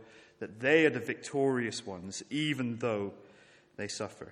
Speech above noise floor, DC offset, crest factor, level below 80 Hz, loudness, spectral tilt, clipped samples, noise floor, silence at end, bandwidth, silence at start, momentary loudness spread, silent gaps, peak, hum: 28 dB; under 0.1%; 22 dB; -76 dBFS; -32 LUFS; -4.5 dB/octave; under 0.1%; -60 dBFS; 0 s; 13.5 kHz; 0 s; 16 LU; none; -10 dBFS; none